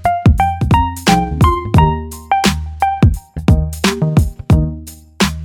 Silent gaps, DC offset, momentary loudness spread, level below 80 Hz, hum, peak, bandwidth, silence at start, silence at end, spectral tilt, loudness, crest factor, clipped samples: none; under 0.1%; 6 LU; -22 dBFS; none; 0 dBFS; 18 kHz; 0 s; 0 s; -6 dB/octave; -14 LUFS; 14 dB; under 0.1%